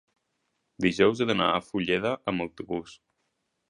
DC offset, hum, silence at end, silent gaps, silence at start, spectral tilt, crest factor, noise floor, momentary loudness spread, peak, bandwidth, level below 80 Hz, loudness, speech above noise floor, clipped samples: under 0.1%; none; 0.75 s; none; 0.8 s; -5.5 dB/octave; 22 dB; -77 dBFS; 12 LU; -6 dBFS; 11 kHz; -58 dBFS; -27 LUFS; 51 dB; under 0.1%